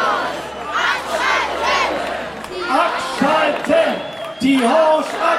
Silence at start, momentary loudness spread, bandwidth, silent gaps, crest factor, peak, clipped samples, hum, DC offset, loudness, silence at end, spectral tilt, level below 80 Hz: 0 s; 11 LU; 15.5 kHz; none; 14 dB; -2 dBFS; under 0.1%; none; under 0.1%; -17 LUFS; 0 s; -3.5 dB/octave; -50 dBFS